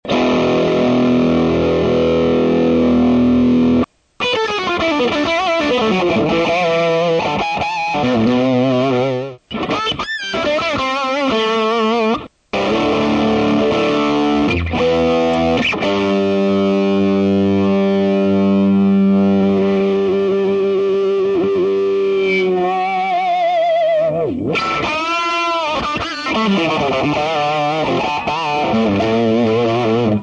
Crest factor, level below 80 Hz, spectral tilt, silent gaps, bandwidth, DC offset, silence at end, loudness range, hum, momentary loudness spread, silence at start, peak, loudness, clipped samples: 10 dB; -42 dBFS; -6.5 dB/octave; none; 8.8 kHz; under 0.1%; 0 s; 3 LU; none; 5 LU; 0.05 s; -6 dBFS; -15 LUFS; under 0.1%